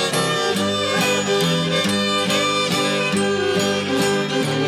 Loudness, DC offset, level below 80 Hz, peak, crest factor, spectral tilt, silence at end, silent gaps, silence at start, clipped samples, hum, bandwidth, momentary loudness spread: -19 LUFS; under 0.1%; -58 dBFS; -6 dBFS; 12 dB; -3.5 dB/octave; 0 s; none; 0 s; under 0.1%; none; 16.5 kHz; 2 LU